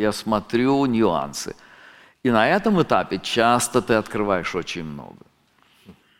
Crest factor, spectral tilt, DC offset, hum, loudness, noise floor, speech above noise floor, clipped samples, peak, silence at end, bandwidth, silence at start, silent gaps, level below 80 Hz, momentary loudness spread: 20 dB; -4.5 dB/octave; under 0.1%; none; -21 LUFS; -60 dBFS; 39 dB; under 0.1%; -2 dBFS; 0.25 s; 16.5 kHz; 0 s; none; -50 dBFS; 13 LU